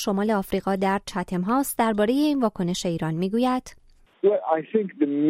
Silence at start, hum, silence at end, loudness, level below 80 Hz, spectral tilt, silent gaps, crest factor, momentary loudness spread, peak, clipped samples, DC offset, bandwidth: 0 s; none; 0 s; -24 LUFS; -52 dBFS; -6 dB/octave; none; 16 dB; 5 LU; -8 dBFS; under 0.1%; under 0.1%; 16 kHz